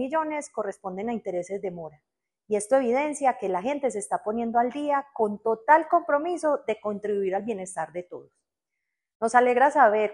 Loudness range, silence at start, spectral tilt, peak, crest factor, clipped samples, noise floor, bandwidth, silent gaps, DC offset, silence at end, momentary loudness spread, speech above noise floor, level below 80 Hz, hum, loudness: 4 LU; 0 s; -4.5 dB/octave; -4 dBFS; 20 dB; under 0.1%; -85 dBFS; 11.5 kHz; 9.15-9.20 s; under 0.1%; 0 s; 13 LU; 60 dB; -70 dBFS; none; -25 LUFS